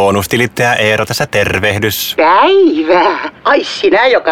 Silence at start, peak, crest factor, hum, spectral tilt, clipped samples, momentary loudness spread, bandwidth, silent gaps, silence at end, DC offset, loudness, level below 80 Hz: 0 s; 0 dBFS; 10 dB; none; -4.5 dB/octave; under 0.1%; 6 LU; 17.5 kHz; none; 0 s; under 0.1%; -11 LUFS; -42 dBFS